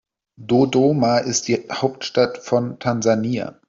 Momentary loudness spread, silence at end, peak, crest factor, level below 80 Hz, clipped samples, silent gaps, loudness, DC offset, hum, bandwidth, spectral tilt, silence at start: 7 LU; 0.15 s; -2 dBFS; 16 dB; -60 dBFS; under 0.1%; none; -19 LUFS; under 0.1%; none; 7.6 kHz; -5 dB/octave; 0.4 s